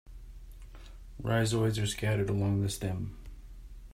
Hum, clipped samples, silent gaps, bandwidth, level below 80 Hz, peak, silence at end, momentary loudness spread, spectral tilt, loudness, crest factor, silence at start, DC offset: none; under 0.1%; none; 15.5 kHz; -48 dBFS; -16 dBFS; 0 s; 23 LU; -5.5 dB/octave; -31 LUFS; 18 dB; 0.05 s; under 0.1%